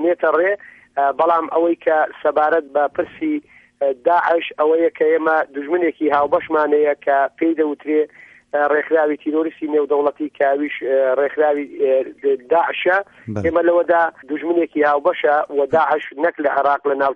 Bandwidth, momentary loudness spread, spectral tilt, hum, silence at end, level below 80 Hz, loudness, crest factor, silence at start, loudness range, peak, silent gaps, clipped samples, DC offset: 5.4 kHz; 5 LU; -7.5 dB/octave; none; 0 s; -60 dBFS; -18 LUFS; 14 dB; 0 s; 2 LU; -4 dBFS; none; under 0.1%; under 0.1%